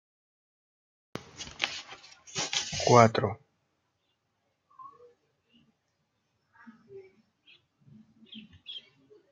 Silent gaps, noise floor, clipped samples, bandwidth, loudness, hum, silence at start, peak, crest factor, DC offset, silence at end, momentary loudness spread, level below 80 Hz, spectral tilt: none; -78 dBFS; under 0.1%; 9.4 kHz; -26 LUFS; none; 1.15 s; -4 dBFS; 30 dB; under 0.1%; 0.55 s; 31 LU; -68 dBFS; -4 dB/octave